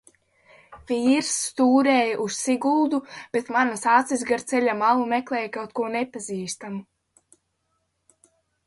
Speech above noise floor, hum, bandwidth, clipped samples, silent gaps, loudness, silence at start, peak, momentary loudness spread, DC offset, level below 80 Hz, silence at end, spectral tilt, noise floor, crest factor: 51 dB; none; 11.5 kHz; under 0.1%; none; -23 LUFS; 0.7 s; -6 dBFS; 11 LU; under 0.1%; -66 dBFS; 1.85 s; -3.5 dB/octave; -74 dBFS; 18 dB